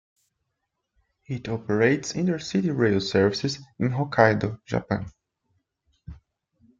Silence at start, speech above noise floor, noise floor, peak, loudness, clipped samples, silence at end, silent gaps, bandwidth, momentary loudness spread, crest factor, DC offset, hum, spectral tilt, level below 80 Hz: 1.3 s; 56 dB; -80 dBFS; -4 dBFS; -24 LUFS; under 0.1%; 0.65 s; none; 7.8 kHz; 11 LU; 22 dB; under 0.1%; none; -6 dB/octave; -56 dBFS